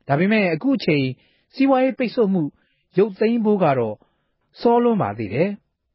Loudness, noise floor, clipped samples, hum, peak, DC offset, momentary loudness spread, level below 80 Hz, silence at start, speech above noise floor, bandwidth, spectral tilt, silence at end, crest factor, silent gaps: -20 LUFS; -67 dBFS; under 0.1%; none; -4 dBFS; under 0.1%; 10 LU; -60 dBFS; 0.1 s; 48 dB; 5.8 kHz; -11.5 dB/octave; 0.4 s; 16 dB; none